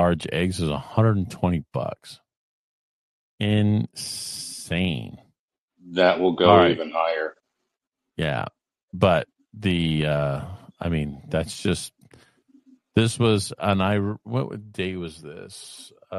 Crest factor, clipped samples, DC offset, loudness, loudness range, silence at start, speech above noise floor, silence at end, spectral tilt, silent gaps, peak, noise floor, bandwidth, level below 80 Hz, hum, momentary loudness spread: 24 dB; under 0.1%; under 0.1%; -24 LUFS; 6 LU; 0 s; 60 dB; 0 s; -6 dB/octave; 2.37-3.38 s, 5.39-5.48 s, 5.58-5.68 s, 8.83-8.88 s; 0 dBFS; -83 dBFS; 13 kHz; -48 dBFS; none; 19 LU